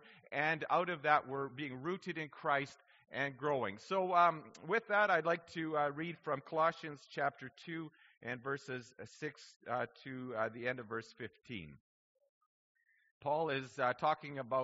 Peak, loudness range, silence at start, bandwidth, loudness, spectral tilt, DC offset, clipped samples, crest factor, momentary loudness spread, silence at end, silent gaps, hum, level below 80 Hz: -16 dBFS; 9 LU; 0.05 s; 7.6 kHz; -37 LUFS; -3 dB/octave; under 0.1%; under 0.1%; 22 dB; 15 LU; 0 s; 8.17-8.21 s, 9.56-9.60 s, 11.80-12.15 s, 12.29-12.75 s, 13.11-13.21 s; none; -80 dBFS